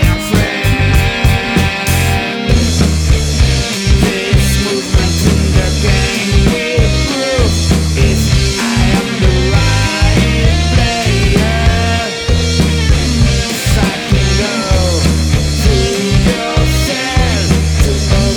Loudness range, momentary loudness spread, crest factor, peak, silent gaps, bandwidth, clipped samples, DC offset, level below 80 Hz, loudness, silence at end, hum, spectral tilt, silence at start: 1 LU; 2 LU; 10 dB; 0 dBFS; none; 19.5 kHz; under 0.1%; under 0.1%; -16 dBFS; -12 LUFS; 0 s; none; -5 dB/octave; 0 s